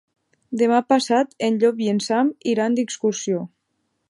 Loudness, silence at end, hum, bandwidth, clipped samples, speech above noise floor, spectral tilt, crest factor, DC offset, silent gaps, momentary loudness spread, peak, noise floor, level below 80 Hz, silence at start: -21 LUFS; 0.65 s; none; 11.5 kHz; under 0.1%; 53 dB; -4.5 dB/octave; 18 dB; under 0.1%; none; 8 LU; -4 dBFS; -73 dBFS; -74 dBFS; 0.5 s